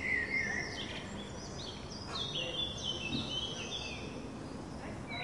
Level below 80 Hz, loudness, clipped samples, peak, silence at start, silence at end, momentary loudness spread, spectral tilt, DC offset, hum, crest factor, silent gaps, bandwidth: -56 dBFS; -38 LUFS; under 0.1%; -24 dBFS; 0 s; 0 s; 11 LU; -3.5 dB/octave; under 0.1%; none; 16 dB; none; 11.5 kHz